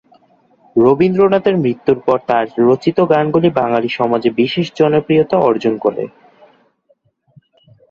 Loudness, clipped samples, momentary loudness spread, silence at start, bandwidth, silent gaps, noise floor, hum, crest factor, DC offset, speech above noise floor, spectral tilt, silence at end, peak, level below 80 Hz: -14 LUFS; under 0.1%; 5 LU; 0.75 s; 7 kHz; none; -59 dBFS; none; 14 dB; under 0.1%; 46 dB; -8 dB/octave; 1.85 s; 0 dBFS; -54 dBFS